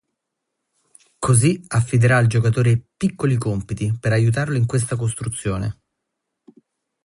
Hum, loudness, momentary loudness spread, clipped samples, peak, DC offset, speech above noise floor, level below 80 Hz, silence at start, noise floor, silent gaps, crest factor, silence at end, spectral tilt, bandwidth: none; -20 LUFS; 9 LU; under 0.1%; -4 dBFS; under 0.1%; 61 dB; -46 dBFS; 1.2 s; -79 dBFS; none; 16 dB; 1.3 s; -6 dB/octave; 11.5 kHz